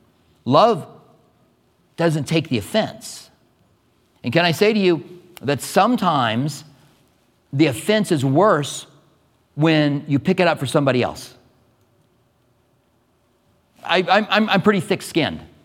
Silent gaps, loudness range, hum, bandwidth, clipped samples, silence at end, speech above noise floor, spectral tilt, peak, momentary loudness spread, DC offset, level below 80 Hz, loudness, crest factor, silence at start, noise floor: none; 6 LU; none; 16.5 kHz; under 0.1%; 0.2 s; 44 dB; -5.5 dB/octave; 0 dBFS; 16 LU; under 0.1%; -60 dBFS; -19 LUFS; 20 dB; 0.45 s; -62 dBFS